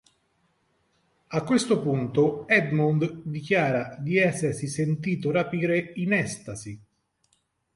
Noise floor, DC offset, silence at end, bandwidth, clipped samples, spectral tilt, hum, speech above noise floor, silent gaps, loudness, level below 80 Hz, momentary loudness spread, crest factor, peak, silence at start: -71 dBFS; under 0.1%; 1 s; 11.5 kHz; under 0.1%; -6 dB/octave; none; 46 dB; none; -25 LUFS; -62 dBFS; 11 LU; 20 dB; -6 dBFS; 1.3 s